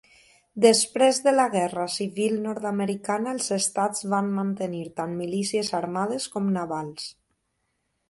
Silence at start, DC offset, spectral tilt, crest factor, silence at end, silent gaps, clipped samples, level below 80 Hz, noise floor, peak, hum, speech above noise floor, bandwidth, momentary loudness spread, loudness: 0.55 s; under 0.1%; -4 dB/octave; 22 dB; 0.95 s; none; under 0.1%; -70 dBFS; -75 dBFS; -4 dBFS; none; 51 dB; 12 kHz; 12 LU; -25 LUFS